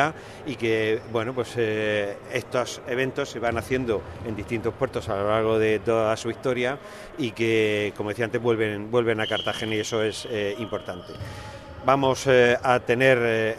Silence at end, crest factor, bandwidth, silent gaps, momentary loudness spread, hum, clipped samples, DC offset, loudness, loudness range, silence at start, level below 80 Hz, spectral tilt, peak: 0 s; 20 dB; 13.5 kHz; none; 13 LU; none; under 0.1%; under 0.1%; -24 LUFS; 3 LU; 0 s; -54 dBFS; -5 dB/octave; -4 dBFS